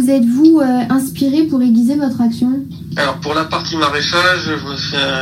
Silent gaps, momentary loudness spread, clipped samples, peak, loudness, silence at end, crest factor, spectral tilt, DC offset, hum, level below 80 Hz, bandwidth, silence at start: none; 8 LU; under 0.1%; 0 dBFS; -14 LUFS; 0 s; 14 dB; -5 dB/octave; under 0.1%; none; -46 dBFS; 16 kHz; 0 s